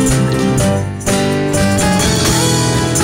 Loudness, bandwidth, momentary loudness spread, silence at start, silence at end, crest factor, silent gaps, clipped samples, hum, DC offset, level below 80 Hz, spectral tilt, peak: -13 LUFS; 16.5 kHz; 4 LU; 0 s; 0 s; 10 dB; none; under 0.1%; none; under 0.1%; -28 dBFS; -4.5 dB/octave; -2 dBFS